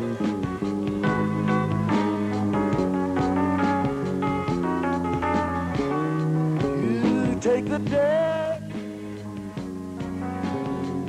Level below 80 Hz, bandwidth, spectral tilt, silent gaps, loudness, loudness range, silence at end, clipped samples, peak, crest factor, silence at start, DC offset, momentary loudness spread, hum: -48 dBFS; 12.5 kHz; -7.5 dB/octave; none; -25 LUFS; 3 LU; 0 s; under 0.1%; -12 dBFS; 12 dB; 0 s; under 0.1%; 11 LU; none